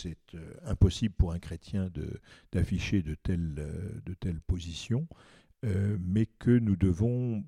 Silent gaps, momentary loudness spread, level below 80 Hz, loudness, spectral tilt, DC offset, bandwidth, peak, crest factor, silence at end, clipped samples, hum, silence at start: none; 14 LU; -42 dBFS; -31 LUFS; -7.5 dB/octave; under 0.1%; 11 kHz; -10 dBFS; 20 dB; 0 s; under 0.1%; none; 0 s